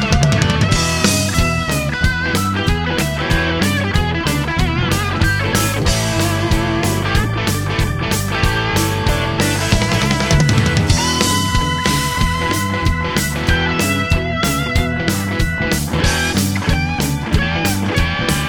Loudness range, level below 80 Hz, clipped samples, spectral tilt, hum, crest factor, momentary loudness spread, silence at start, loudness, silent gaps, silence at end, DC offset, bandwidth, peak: 2 LU; -24 dBFS; under 0.1%; -4.5 dB/octave; none; 16 dB; 4 LU; 0 s; -16 LUFS; none; 0 s; under 0.1%; over 20 kHz; 0 dBFS